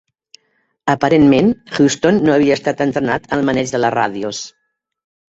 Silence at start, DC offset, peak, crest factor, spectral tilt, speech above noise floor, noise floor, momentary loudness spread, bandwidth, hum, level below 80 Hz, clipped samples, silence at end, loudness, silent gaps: 0.85 s; under 0.1%; 0 dBFS; 16 dB; -5.5 dB/octave; 50 dB; -64 dBFS; 12 LU; 8 kHz; none; -48 dBFS; under 0.1%; 0.8 s; -15 LUFS; none